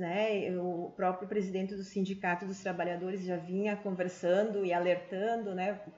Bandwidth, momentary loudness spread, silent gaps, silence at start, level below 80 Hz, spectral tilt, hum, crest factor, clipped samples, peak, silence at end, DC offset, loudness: 7.8 kHz; 6 LU; none; 0 s; -76 dBFS; -5 dB/octave; none; 16 dB; under 0.1%; -18 dBFS; 0 s; under 0.1%; -34 LUFS